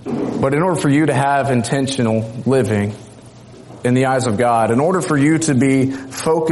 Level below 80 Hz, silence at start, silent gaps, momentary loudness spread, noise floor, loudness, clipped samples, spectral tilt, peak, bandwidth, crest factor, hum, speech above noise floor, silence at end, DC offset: -52 dBFS; 0.05 s; none; 6 LU; -39 dBFS; -16 LUFS; under 0.1%; -6 dB/octave; -4 dBFS; 11.5 kHz; 12 dB; none; 24 dB; 0 s; under 0.1%